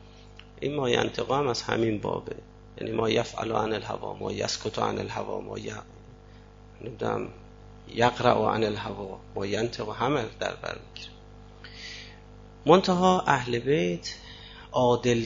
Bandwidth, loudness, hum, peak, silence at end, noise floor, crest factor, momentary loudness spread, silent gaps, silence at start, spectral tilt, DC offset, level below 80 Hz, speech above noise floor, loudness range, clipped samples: 7.8 kHz; -27 LUFS; 50 Hz at -50 dBFS; -4 dBFS; 0 s; -49 dBFS; 24 dB; 19 LU; none; 0 s; -5 dB/octave; under 0.1%; -52 dBFS; 23 dB; 7 LU; under 0.1%